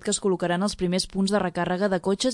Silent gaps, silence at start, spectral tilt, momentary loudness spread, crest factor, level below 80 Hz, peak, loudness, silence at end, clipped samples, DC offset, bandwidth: none; 0 s; -4.5 dB/octave; 1 LU; 16 dB; -50 dBFS; -10 dBFS; -25 LUFS; 0 s; under 0.1%; under 0.1%; 11.5 kHz